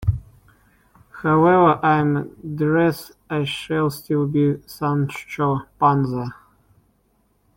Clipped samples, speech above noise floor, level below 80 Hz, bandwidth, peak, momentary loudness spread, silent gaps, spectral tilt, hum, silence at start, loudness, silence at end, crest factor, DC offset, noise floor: under 0.1%; 44 dB; -46 dBFS; 16.5 kHz; -4 dBFS; 12 LU; none; -7.5 dB/octave; none; 0 s; -20 LUFS; 1.25 s; 18 dB; under 0.1%; -63 dBFS